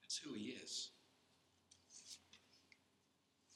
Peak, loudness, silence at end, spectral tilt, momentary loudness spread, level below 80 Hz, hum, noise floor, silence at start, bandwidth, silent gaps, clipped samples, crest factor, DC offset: -32 dBFS; -50 LUFS; 0 s; -1.5 dB/octave; 21 LU; under -90 dBFS; none; -80 dBFS; 0 s; 13 kHz; none; under 0.1%; 24 dB; under 0.1%